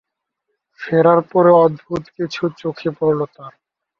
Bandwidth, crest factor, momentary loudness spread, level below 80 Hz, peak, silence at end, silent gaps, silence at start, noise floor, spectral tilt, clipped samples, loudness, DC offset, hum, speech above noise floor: 6.8 kHz; 16 dB; 15 LU; -58 dBFS; -2 dBFS; 0.5 s; none; 0.8 s; -76 dBFS; -8 dB/octave; under 0.1%; -16 LUFS; under 0.1%; none; 60 dB